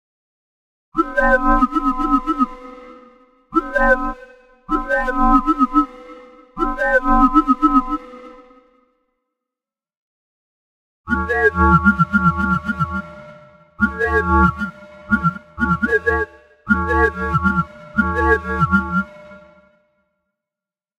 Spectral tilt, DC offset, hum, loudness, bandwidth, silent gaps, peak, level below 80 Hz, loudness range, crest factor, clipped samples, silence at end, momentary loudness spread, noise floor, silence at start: -8 dB/octave; under 0.1%; none; -18 LUFS; 11.5 kHz; 9.97-11.04 s; 0 dBFS; -30 dBFS; 4 LU; 18 dB; under 0.1%; 1.6 s; 12 LU; -89 dBFS; 0.95 s